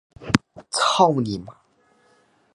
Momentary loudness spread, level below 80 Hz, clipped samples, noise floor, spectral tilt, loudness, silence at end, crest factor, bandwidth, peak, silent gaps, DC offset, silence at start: 11 LU; -52 dBFS; under 0.1%; -61 dBFS; -4.5 dB/octave; -21 LUFS; 1.05 s; 24 dB; 11.5 kHz; 0 dBFS; none; under 0.1%; 0.2 s